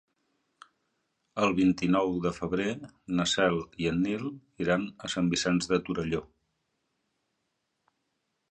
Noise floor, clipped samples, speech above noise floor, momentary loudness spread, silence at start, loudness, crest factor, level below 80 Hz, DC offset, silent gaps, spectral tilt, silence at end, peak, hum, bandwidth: -80 dBFS; under 0.1%; 51 dB; 9 LU; 1.35 s; -29 LUFS; 20 dB; -56 dBFS; under 0.1%; none; -5 dB/octave; 2.25 s; -10 dBFS; none; 9.4 kHz